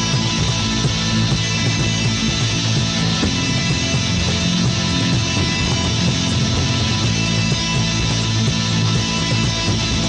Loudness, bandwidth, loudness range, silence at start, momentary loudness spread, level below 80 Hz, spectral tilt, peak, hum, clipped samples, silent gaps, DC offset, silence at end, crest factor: -17 LUFS; 9.6 kHz; 0 LU; 0 s; 1 LU; -32 dBFS; -4 dB/octave; -6 dBFS; none; under 0.1%; none; under 0.1%; 0 s; 12 dB